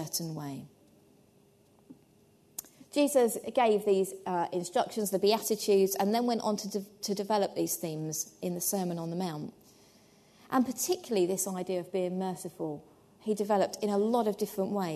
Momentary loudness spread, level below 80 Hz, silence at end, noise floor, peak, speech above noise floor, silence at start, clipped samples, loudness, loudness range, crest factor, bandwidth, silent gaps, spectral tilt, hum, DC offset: 12 LU; -76 dBFS; 0 s; -63 dBFS; -14 dBFS; 33 dB; 0 s; under 0.1%; -31 LUFS; 5 LU; 18 dB; 13.5 kHz; none; -4.5 dB/octave; none; under 0.1%